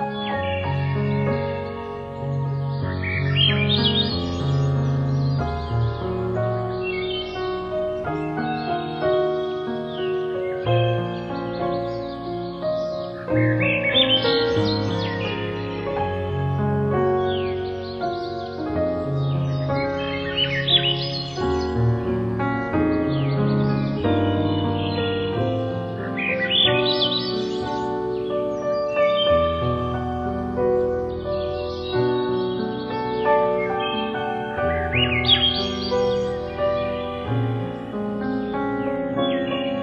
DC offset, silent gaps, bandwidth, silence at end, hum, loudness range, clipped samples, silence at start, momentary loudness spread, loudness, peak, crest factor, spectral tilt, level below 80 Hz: under 0.1%; none; 7.4 kHz; 0 s; none; 4 LU; under 0.1%; 0 s; 9 LU; -23 LUFS; -4 dBFS; 18 dB; -7 dB/octave; -40 dBFS